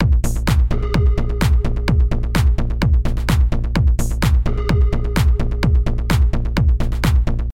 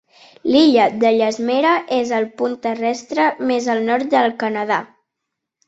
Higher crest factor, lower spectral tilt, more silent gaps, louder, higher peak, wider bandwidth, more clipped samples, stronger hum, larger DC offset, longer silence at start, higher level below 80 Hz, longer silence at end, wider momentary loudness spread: about the same, 12 dB vs 16 dB; first, -6.5 dB/octave vs -4.5 dB/octave; neither; about the same, -18 LUFS vs -17 LUFS; about the same, -4 dBFS vs -2 dBFS; first, 16 kHz vs 8 kHz; neither; neither; neither; second, 0 s vs 0.45 s; first, -16 dBFS vs -62 dBFS; second, 0 s vs 0.8 s; second, 1 LU vs 9 LU